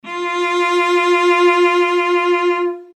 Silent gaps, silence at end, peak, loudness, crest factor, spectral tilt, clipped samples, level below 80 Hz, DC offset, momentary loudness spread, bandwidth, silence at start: none; 0.1 s; -4 dBFS; -15 LUFS; 12 dB; -2 dB/octave; under 0.1%; -86 dBFS; under 0.1%; 6 LU; 10 kHz; 0.05 s